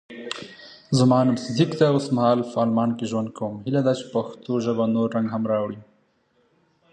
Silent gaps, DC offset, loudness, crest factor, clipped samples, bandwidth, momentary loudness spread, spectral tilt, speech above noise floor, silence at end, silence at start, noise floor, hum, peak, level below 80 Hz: none; under 0.1%; -23 LUFS; 18 dB; under 0.1%; 9.6 kHz; 14 LU; -7 dB/octave; 43 dB; 1.1 s; 0.1 s; -65 dBFS; none; -4 dBFS; -64 dBFS